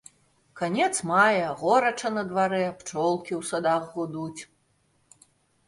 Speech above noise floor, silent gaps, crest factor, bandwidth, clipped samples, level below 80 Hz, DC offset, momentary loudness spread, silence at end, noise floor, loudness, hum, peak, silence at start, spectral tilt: 43 dB; none; 20 dB; 11.5 kHz; under 0.1%; -70 dBFS; under 0.1%; 12 LU; 1.25 s; -68 dBFS; -25 LUFS; none; -8 dBFS; 0.55 s; -4 dB/octave